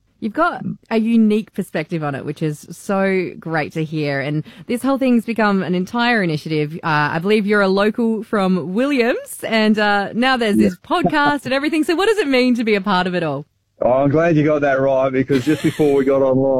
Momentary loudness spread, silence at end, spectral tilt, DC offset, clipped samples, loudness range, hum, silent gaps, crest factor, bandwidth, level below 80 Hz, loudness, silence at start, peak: 8 LU; 0 s; -6.5 dB/octave; under 0.1%; under 0.1%; 4 LU; none; none; 14 dB; 15 kHz; -52 dBFS; -17 LUFS; 0.2 s; -4 dBFS